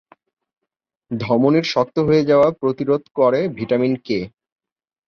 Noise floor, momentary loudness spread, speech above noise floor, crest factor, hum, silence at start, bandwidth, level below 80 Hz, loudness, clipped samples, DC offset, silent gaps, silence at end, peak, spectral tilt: -81 dBFS; 10 LU; 64 dB; 16 dB; none; 1.1 s; 7 kHz; -56 dBFS; -18 LUFS; under 0.1%; under 0.1%; 3.11-3.15 s; 0.8 s; -4 dBFS; -7 dB/octave